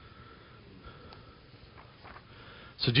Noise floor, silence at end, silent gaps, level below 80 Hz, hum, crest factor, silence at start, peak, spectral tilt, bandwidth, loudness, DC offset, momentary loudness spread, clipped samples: -54 dBFS; 0 s; none; -58 dBFS; none; 28 dB; 0.2 s; -10 dBFS; -3.5 dB/octave; 5.2 kHz; -37 LUFS; under 0.1%; 16 LU; under 0.1%